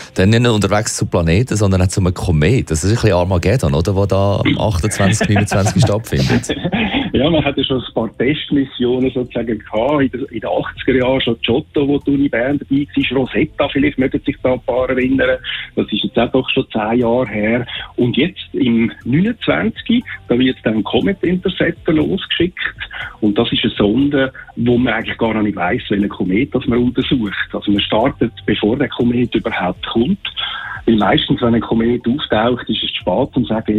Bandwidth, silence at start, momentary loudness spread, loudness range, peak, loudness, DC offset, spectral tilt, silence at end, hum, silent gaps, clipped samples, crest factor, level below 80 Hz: 15 kHz; 0 s; 5 LU; 2 LU; -2 dBFS; -16 LUFS; under 0.1%; -5.5 dB/octave; 0 s; none; none; under 0.1%; 14 dB; -36 dBFS